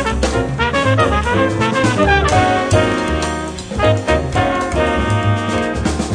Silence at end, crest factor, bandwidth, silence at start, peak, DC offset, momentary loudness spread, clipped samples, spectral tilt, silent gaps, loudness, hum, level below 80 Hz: 0 s; 14 dB; 10 kHz; 0 s; 0 dBFS; under 0.1%; 5 LU; under 0.1%; -5.5 dB/octave; none; -16 LUFS; none; -26 dBFS